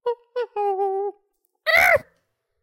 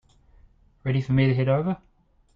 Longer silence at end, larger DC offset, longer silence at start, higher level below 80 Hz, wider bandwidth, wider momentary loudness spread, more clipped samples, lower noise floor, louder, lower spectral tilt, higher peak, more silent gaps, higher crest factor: about the same, 0.6 s vs 0.6 s; neither; second, 0.05 s vs 0.85 s; second, -58 dBFS vs -52 dBFS; first, 17 kHz vs 5.2 kHz; about the same, 14 LU vs 12 LU; neither; first, -71 dBFS vs -56 dBFS; first, -21 LUFS vs -24 LUFS; second, -2.5 dB/octave vs -9.5 dB/octave; first, -4 dBFS vs -10 dBFS; neither; about the same, 20 dB vs 16 dB